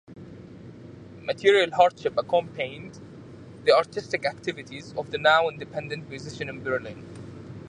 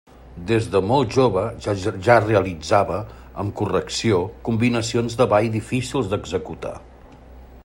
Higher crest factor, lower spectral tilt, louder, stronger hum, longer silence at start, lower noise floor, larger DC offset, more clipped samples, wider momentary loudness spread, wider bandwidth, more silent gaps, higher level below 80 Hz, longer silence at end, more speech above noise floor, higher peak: about the same, 22 dB vs 20 dB; second, -4.5 dB/octave vs -6 dB/octave; second, -25 LUFS vs -21 LUFS; neither; second, 0.1 s vs 0.25 s; about the same, -44 dBFS vs -44 dBFS; neither; neither; first, 24 LU vs 13 LU; second, 10.5 kHz vs 16 kHz; neither; second, -60 dBFS vs -46 dBFS; about the same, 0 s vs 0.05 s; second, 19 dB vs 23 dB; about the same, -4 dBFS vs -2 dBFS